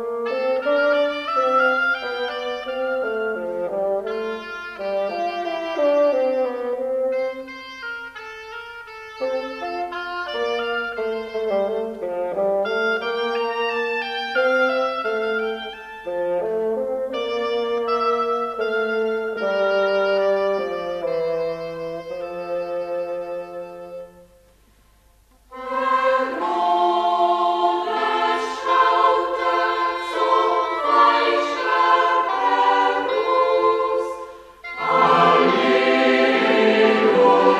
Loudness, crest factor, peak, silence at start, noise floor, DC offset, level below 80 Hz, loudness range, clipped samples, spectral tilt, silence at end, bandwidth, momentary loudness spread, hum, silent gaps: -21 LUFS; 18 dB; -4 dBFS; 0 s; -55 dBFS; under 0.1%; -60 dBFS; 9 LU; under 0.1%; -4.5 dB/octave; 0 s; 12 kHz; 14 LU; none; none